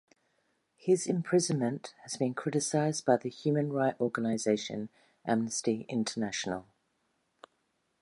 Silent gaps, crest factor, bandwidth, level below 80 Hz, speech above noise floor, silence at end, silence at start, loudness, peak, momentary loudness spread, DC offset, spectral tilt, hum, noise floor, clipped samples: none; 20 dB; 11.5 kHz; -74 dBFS; 46 dB; 1.4 s; 0.85 s; -31 LUFS; -12 dBFS; 11 LU; under 0.1%; -5 dB/octave; none; -77 dBFS; under 0.1%